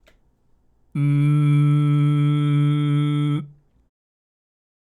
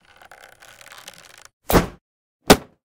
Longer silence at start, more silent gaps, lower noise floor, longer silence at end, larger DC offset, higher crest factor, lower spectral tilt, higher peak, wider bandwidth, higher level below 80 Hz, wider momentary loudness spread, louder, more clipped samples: second, 0.95 s vs 1.7 s; second, none vs 2.01-2.40 s; first, -60 dBFS vs -47 dBFS; first, 1.4 s vs 0.25 s; neither; second, 12 dB vs 24 dB; first, -9 dB/octave vs -4 dB/octave; second, -10 dBFS vs 0 dBFS; second, 3.7 kHz vs 18 kHz; second, -64 dBFS vs -36 dBFS; second, 7 LU vs 25 LU; about the same, -19 LUFS vs -19 LUFS; neither